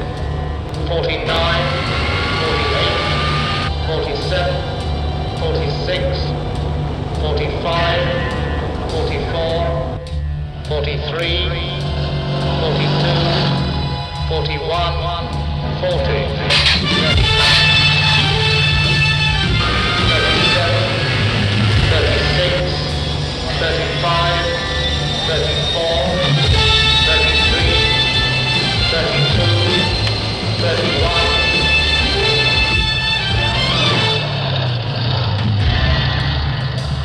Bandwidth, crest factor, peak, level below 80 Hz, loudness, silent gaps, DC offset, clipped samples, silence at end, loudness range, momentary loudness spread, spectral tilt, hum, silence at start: 10.5 kHz; 14 dB; -2 dBFS; -26 dBFS; -15 LUFS; none; under 0.1%; under 0.1%; 0 s; 7 LU; 9 LU; -5 dB/octave; none; 0 s